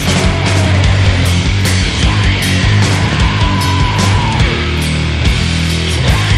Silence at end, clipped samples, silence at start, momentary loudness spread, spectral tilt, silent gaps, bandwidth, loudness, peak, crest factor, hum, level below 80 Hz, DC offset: 0 s; under 0.1%; 0 s; 3 LU; -5 dB/octave; none; 14 kHz; -12 LUFS; 0 dBFS; 10 dB; none; -18 dBFS; under 0.1%